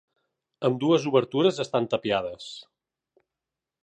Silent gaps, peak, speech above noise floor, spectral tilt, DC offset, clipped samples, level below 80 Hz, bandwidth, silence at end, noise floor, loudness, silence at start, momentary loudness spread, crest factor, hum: none; -8 dBFS; 63 dB; -6 dB/octave; under 0.1%; under 0.1%; -68 dBFS; 9.4 kHz; 1.25 s; -88 dBFS; -25 LUFS; 0.6 s; 17 LU; 20 dB; none